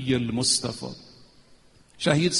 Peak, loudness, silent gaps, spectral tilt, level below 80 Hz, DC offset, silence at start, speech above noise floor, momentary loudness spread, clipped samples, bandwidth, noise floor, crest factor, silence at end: -6 dBFS; -25 LUFS; none; -3.5 dB/octave; -56 dBFS; under 0.1%; 0 s; 31 dB; 16 LU; under 0.1%; 11.5 kHz; -55 dBFS; 20 dB; 0 s